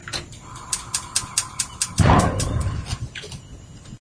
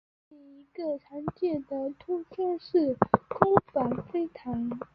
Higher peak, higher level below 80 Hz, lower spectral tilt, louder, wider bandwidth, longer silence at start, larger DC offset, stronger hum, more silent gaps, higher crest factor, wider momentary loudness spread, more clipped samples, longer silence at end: about the same, 0 dBFS vs -2 dBFS; first, -34 dBFS vs -60 dBFS; second, -4 dB/octave vs -10.5 dB/octave; first, -23 LUFS vs -29 LUFS; first, 11 kHz vs 5.4 kHz; second, 0 s vs 0.5 s; neither; neither; neither; about the same, 24 dB vs 28 dB; first, 22 LU vs 11 LU; neither; about the same, 0.05 s vs 0.1 s